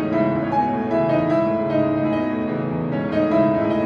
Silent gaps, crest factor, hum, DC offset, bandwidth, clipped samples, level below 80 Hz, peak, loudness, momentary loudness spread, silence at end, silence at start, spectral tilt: none; 12 dB; none; under 0.1%; 6.4 kHz; under 0.1%; -50 dBFS; -6 dBFS; -20 LUFS; 6 LU; 0 s; 0 s; -9.5 dB/octave